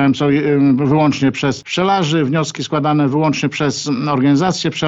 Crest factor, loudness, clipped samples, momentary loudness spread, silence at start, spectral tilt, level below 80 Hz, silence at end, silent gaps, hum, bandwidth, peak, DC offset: 14 dB; -15 LUFS; under 0.1%; 5 LU; 0 s; -6 dB/octave; -52 dBFS; 0 s; none; none; 8 kHz; -2 dBFS; under 0.1%